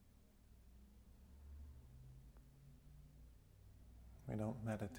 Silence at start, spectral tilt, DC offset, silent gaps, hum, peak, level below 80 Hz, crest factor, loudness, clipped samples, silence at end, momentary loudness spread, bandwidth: 0 s; -7.5 dB/octave; under 0.1%; none; none; -34 dBFS; -64 dBFS; 20 dB; -51 LUFS; under 0.1%; 0 s; 21 LU; over 20 kHz